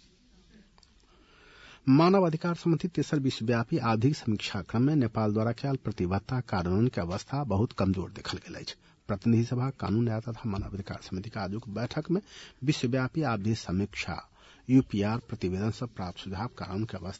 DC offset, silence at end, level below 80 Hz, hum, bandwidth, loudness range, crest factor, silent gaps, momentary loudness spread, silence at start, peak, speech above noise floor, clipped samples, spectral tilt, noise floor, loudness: under 0.1%; 0 s; -56 dBFS; none; 8 kHz; 5 LU; 18 dB; none; 12 LU; 1.65 s; -12 dBFS; 32 dB; under 0.1%; -7 dB/octave; -61 dBFS; -30 LUFS